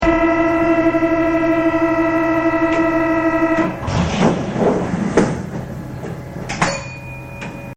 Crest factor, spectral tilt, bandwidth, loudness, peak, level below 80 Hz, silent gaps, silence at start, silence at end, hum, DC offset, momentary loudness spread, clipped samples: 16 dB; -6.5 dB/octave; 9.4 kHz; -17 LUFS; 0 dBFS; -36 dBFS; none; 0 s; 0 s; none; under 0.1%; 14 LU; under 0.1%